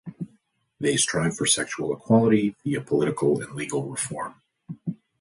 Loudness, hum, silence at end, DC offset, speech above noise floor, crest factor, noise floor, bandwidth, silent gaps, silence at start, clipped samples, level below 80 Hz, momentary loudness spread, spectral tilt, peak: -24 LUFS; none; 0.25 s; under 0.1%; 41 dB; 18 dB; -65 dBFS; 11.5 kHz; none; 0.05 s; under 0.1%; -62 dBFS; 16 LU; -4 dB/octave; -6 dBFS